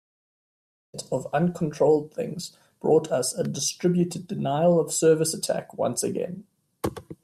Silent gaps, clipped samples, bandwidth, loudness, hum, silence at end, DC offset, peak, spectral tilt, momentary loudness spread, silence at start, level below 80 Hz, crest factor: none; under 0.1%; 15 kHz; -25 LUFS; none; 0.1 s; under 0.1%; -8 dBFS; -5 dB/octave; 12 LU; 0.95 s; -62 dBFS; 16 dB